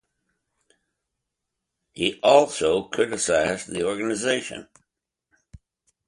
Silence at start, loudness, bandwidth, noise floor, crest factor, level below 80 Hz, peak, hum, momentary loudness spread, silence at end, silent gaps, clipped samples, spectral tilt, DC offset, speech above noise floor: 1.95 s; -22 LUFS; 11.5 kHz; -82 dBFS; 22 dB; -58 dBFS; -4 dBFS; none; 10 LU; 1.45 s; none; under 0.1%; -3 dB/octave; under 0.1%; 60 dB